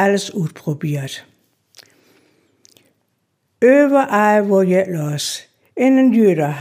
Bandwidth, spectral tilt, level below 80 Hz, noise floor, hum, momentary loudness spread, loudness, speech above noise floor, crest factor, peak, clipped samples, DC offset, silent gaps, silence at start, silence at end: 16 kHz; -6 dB/octave; -74 dBFS; -68 dBFS; none; 13 LU; -16 LUFS; 53 dB; 16 dB; -2 dBFS; under 0.1%; under 0.1%; none; 0 s; 0 s